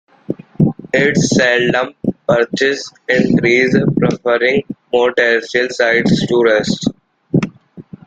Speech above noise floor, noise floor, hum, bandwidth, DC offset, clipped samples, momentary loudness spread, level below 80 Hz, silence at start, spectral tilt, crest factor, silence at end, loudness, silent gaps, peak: 23 dB; -37 dBFS; none; 9.2 kHz; under 0.1%; under 0.1%; 9 LU; -48 dBFS; 0.3 s; -5.5 dB/octave; 14 dB; 0.25 s; -14 LUFS; none; 0 dBFS